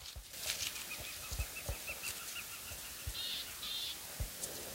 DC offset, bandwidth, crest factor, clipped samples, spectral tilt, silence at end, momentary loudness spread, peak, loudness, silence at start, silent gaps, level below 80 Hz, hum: under 0.1%; 16 kHz; 28 dB; under 0.1%; -1 dB/octave; 0 s; 5 LU; -16 dBFS; -41 LUFS; 0 s; none; -52 dBFS; none